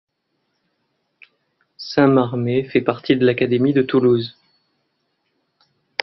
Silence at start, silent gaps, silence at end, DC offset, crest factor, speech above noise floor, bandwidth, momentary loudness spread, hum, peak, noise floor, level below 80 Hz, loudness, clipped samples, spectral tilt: 1.8 s; none; 1.75 s; under 0.1%; 20 dB; 55 dB; 6 kHz; 9 LU; none; 0 dBFS; -72 dBFS; -58 dBFS; -18 LUFS; under 0.1%; -8 dB/octave